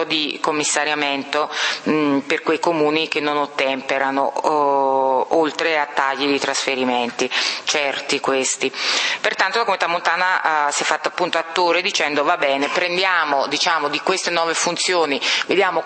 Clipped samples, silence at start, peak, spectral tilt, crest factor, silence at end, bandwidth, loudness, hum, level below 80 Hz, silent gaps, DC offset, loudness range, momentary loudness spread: under 0.1%; 0 s; 0 dBFS; -2 dB/octave; 20 dB; 0 s; 8.8 kHz; -19 LUFS; none; -74 dBFS; none; under 0.1%; 1 LU; 3 LU